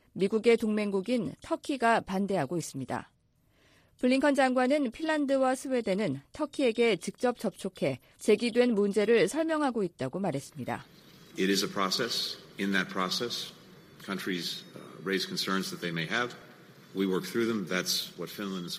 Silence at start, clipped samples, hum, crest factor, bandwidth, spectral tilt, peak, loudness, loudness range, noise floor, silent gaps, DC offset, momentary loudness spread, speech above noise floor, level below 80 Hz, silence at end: 0.15 s; under 0.1%; none; 18 dB; 15.5 kHz; -4.5 dB/octave; -12 dBFS; -30 LUFS; 5 LU; -68 dBFS; none; under 0.1%; 12 LU; 38 dB; -68 dBFS; 0 s